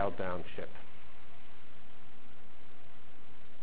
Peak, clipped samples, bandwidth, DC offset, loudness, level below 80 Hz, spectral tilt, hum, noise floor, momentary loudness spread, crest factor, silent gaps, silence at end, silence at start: -20 dBFS; under 0.1%; 4 kHz; 4%; -42 LUFS; -64 dBFS; -8.5 dB/octave; none; -59 dBFS; 19 LU; 26 dB; none; 0 s; 0 s